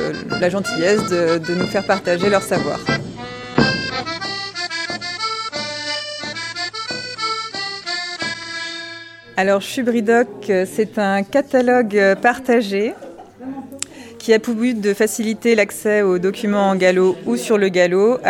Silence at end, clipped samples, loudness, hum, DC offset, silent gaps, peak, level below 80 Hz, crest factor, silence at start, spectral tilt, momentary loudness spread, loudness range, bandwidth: 0 s; under 0.1%; -18 LUFS; none; under 0.1%; none; 0 dBFS; -52 dBFS; 18 dB; 0 s; -4.5 dB/octave; 11 LU; 7 LU; 17 kHz